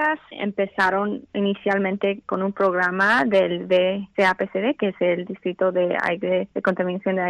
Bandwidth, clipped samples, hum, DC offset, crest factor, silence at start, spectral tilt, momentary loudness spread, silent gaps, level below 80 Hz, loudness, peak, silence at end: 11.5 kHz; under 0.1%; none; under 0.1%; 14 dB; 0 s; -6.5 dB/octave; 7 LU; none; -64 dBFS; -22 LUFS; -8 dBFS; 0 s